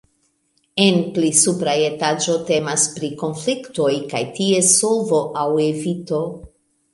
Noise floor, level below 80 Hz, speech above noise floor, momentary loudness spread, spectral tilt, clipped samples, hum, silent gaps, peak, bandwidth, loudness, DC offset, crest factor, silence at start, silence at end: -65 dBFS; -58 dBFS; 47 dB; 10 LU; -3.5 dB/octave; under 0.1%; none; none; 0 dBFS; 11.5 kHz; -18 LUFS; under 0.1%; 20 dB; 0.75 s; 0.45 s